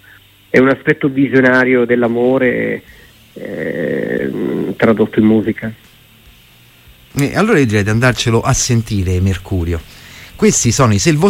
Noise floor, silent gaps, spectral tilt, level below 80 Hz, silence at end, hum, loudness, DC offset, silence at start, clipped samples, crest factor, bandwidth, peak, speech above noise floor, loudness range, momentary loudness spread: -45 dBFS; none; -5 dB/octave; -38 dBFS; 0 s; none; -14 LUFS; under 0.1%; 0.55 s; under 0.1%; 14 dB; 16.5 kHz; 0 dBFS; 32 dB; 3 LU; 12 LU